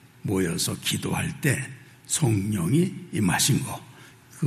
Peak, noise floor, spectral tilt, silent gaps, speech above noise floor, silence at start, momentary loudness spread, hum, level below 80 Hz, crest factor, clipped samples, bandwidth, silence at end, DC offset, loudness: -8 dBFS; -48 dBFS; -4.5 dB/octave; none; 24 dB; 0.25 s; 9 LU; none; -58 dBFS; 18 dB; under 0.1%; 14 kHz; 0 s; under 0.1%; -25 LUFS